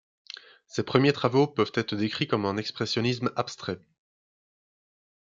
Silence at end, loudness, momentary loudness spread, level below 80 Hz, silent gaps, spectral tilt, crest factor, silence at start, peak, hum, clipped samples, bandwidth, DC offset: 1.55 s; -27 LUFS; 18 LU; -70 dBFS; none; -6 dB/octave; 22 dB; 0.75 s; -8 dBFS; none; under 0.1%; 7.6 kHz; under 0.1%